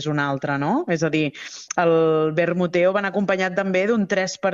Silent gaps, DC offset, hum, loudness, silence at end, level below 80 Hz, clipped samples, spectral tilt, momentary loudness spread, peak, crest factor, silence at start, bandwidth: none; under 0.1%; none; -21 LUFS; 0 s; -62 dBFS; under 0.1%; -5.5 dB/octave; 5 LU; -6 dBFS; 16 dB; 0 s; 7.8 kHz